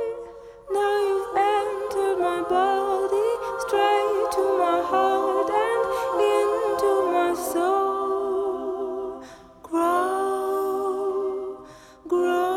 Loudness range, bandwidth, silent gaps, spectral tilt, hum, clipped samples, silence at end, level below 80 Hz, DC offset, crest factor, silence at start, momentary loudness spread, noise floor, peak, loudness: 4 LU; 16 kHz; none; -3.5 dB/octave; none; under 0.1%; 0 s; -58 dBFS; under 0.1%; 16 dB; 0 s; 8 LU; -45 dBFS; -8 dBFS; -24 LUFS